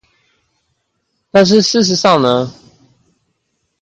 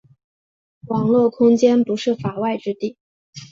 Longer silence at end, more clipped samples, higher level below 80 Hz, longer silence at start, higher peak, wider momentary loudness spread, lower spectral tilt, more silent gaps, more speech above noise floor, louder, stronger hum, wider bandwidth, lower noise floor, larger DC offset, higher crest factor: first, 1.3 s vs 0.1 s; neither; first, -54 dBFS vs -62 dBFS; first, 1.35 s vs 0.85 s; first, 0 dBFS vs -4 dBFS; second, 7 LU vs 11 LU; second, -4.5 dB/octave vs -7 dB/octave; second, none vs 3.00-3.33 s; second, 57 dB vs over 73 dB; first, -12 LUFS vs -19 LUFS; neither; first, 9.2 kHz vs 7.6 kHz; second, -68 dBFS vs under -90 dBFS; neither; about the same, 16 dB vs 16 dB